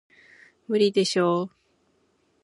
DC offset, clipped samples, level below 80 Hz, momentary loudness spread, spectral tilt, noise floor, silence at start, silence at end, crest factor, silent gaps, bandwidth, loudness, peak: under 0.1%; under 0.1%; -76 dBFS; 7 LU; -5 dB/octave; -67 dBFS; 0.7 s; 0.95 s; 18 dB; none; 11.5 kHz; -23 LUFS; -8 dBFS